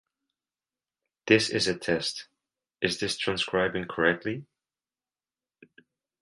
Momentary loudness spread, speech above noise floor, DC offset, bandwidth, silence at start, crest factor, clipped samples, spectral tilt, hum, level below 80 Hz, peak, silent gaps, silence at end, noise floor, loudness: 12 LU; over 63 dB; under 0.1%; 11.5 kHz; 1.25 s; 24 dB; under 0.1%; -4 dB/octave; none; -62 dBFS; -6 dBFS; none; 1.8 s; under -90 dBFS; -27 LUFS